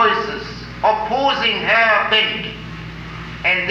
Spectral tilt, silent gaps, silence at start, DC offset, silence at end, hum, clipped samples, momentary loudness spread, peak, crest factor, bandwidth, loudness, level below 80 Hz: -4.5 dB/octave; none; 0 s; under 0.1%; 0 s; none; under 0.1%; 18 LU; -2 dBFS; 16 dB; 13.5 kHz; -16 LUFS; -42 dBFS